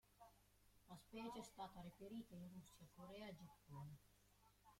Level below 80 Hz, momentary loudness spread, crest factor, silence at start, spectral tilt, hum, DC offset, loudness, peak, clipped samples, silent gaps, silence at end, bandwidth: -78 dBFS; 10 LU; 18 dB; 0.05 s; -5.5 dB/octave; 50 Hz at -75 dBFS; under 0.1%; -59 LUFS; -42 dBFS; under 0.1%; none; 0 s; 16.5 kHz